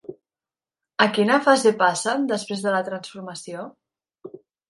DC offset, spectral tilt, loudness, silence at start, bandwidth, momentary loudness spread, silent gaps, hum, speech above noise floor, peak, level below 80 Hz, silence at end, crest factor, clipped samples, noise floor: under 0.1%; -3.5 dB/octave; -20 LUFS; 0.1 s; 11.5 kHz; 18 LU; none; none; over 69 dB; 0 dBFS; -74 dBFS; 0.35 s; 22 dB; under 0.1%; under -90 dBFS